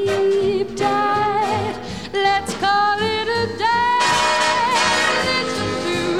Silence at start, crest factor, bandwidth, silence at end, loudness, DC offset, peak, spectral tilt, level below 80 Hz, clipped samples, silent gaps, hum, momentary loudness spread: 0 s; 14 dB; 15 kHz; 0 s; -18 LUFS; 0.6%; -4 dBFS; -3 dB/octave; -48 dBFS; under 0.1%; none; none; 6 LU